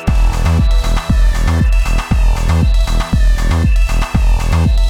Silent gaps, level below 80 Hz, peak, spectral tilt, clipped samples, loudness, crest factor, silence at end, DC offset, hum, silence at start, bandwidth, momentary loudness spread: none; -12 dBFS; -4 dBFS; -6 dB/octave; under 0.1%; -15 LUFS; 8 dB; 0 s; under 0.1%; none; 0 s; 12.5 kHz; 2 LU